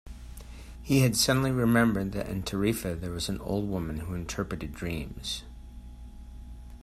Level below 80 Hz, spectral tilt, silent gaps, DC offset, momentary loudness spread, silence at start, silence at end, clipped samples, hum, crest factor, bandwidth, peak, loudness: -44 dBFS; -5 dB/octave; none; under 0.1%; 24 LU; 0.05 s; 0 s; under 0.1%; 60 Hz at -45 dBFS; 20 dB; 15.5 kHz; -10 dBFS; -29 LUFS